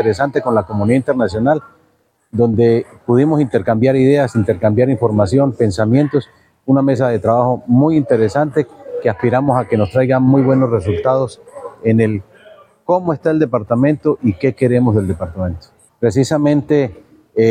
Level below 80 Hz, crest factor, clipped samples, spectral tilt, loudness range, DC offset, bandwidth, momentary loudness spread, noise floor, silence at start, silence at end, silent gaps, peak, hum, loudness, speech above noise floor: -50 dBFS; 12 dB; under 0.1%; -8.5 dB/octave; 3 LU; under 0.1%; 10.5 kHz; 9 LU; -58 dBFS; 0 s; 0 s; none; -2 dBFS; none; -15 LUFS; 45 dB